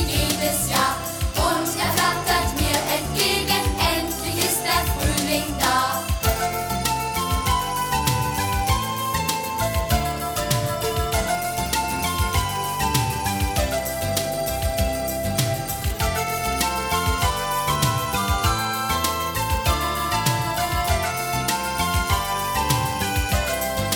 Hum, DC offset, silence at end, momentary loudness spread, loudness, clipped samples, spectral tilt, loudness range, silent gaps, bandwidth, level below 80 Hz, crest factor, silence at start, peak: none; under 0.1%; 0 s; 4 LU; -22 LUFS; under 0.1%; -3.5 dB/octave; 2 LU; none; 19.5 kHz; -32 dBFS; 16 dB; 0 s; -6 dBFS